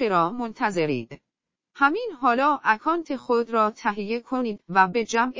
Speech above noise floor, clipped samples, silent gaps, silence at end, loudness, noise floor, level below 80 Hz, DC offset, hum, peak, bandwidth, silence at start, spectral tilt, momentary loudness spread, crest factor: 60 dB; under 0.1%; none; 0 s; -24 LUFS; -83 dBFS; -66 dBFS; under 0.1%; none; -6 dBFS; 7.6 kHz; 0 s; -5 dB/octave; 7 LU; 18 dB